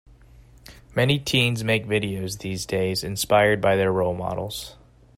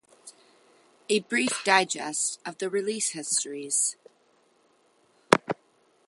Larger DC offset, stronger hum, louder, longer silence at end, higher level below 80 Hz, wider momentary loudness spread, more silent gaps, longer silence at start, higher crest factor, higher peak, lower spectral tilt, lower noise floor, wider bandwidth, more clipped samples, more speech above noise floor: neither; neither; first, -23 LUFS vs -26 LUFS; about the same, 0.45 s vs 0.55 s; first, -50 dBFS vs -70 dBFS; about the same, 11 LU vs 9 LU; neither; first, 0.7 s vs 0.25 s; second, 20 dB vs 30 dB; second, -4 dBFS vs 0 dBFS; first, -4.5 dB/octave vs -2 dB/octave; second, -50 dBFS vs -65 dBFS; about the same, 16 kHz vs 16 kHz; neither; second, 27 dB vs 38 dB